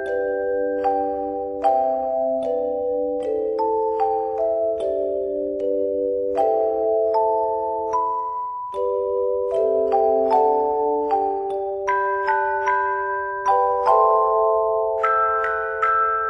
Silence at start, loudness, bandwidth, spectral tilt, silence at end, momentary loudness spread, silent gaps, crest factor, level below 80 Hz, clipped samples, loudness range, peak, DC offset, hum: 0 s; -21 LUFS; 7.8 kHz; -6 dB/octave; 0 s; 6 LU; none; 14 dB; -56 dBFS; under 0.1%; 3 LU; -6 dBFS; under 0.1%; none